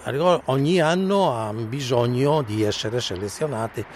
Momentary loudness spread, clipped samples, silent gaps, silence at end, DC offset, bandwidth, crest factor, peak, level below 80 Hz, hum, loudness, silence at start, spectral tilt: 8 LU; under 0.1%; none; 0 s; under 0.1%; 14.5 kHz; 16 dB; -6 dBFS; -54 dBFS; none; -22 LUFS; 0 s; -5.5 dB/octave